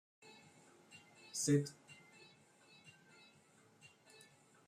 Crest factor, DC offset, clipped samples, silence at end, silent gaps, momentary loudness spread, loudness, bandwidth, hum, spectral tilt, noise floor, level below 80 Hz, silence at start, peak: 22 dB; under 0.1%; under 0.1%; 0.8 s; none; 29 LU; -38 LUFS; 15.5 kHz; none; -5 dB/octave; -69 dBFS; -84 dBFS; 0.95 s; -24 dBFS